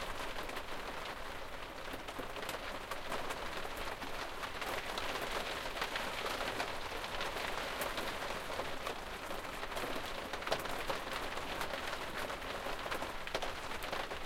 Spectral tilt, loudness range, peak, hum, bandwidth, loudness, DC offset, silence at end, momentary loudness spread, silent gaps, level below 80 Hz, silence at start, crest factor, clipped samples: -2.5 dB/octave; 4 LU; -20 dBFS; none; 16.5 kHz; -40 LUFS; under 0.1%; 0 s; 5 LU; none; -52 dBFS; 0 s; 20 dB; under 0.1%